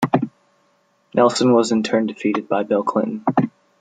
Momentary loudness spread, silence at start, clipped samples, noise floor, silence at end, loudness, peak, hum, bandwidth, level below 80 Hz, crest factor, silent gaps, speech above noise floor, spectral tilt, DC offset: 7 LU; 0 s; under 0.1%; -62 dBFS; 0.3 s; -19 LUFS; -2 dBFS; none; 9.4 kHz; -64 dBFS; 18 dB; none; 44 dB; -5.5 dB/octave; under 0.1%